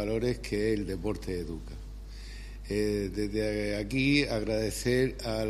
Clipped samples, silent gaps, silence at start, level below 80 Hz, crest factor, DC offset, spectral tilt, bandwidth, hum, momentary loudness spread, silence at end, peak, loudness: under 0.1%; none; 0 s; -42 dBFS; 20 dB; under 0.1%; -5.5 dB/octave; 15 kHz; none; 18 LU; 0 s; -10 dBFS; -30 LUFS